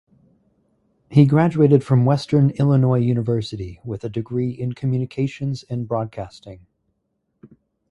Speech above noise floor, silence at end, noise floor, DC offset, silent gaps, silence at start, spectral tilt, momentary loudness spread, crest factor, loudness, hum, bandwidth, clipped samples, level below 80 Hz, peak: 54 dB; 0.45 s; -72 dBFS; under 0.1%; none; 1.1 s; -9 dB/octave; 15 LU; 20 dB; -20 LUFS; none; 8.6 kHz; under 0.1%; -52 dBFS; 0 dBFS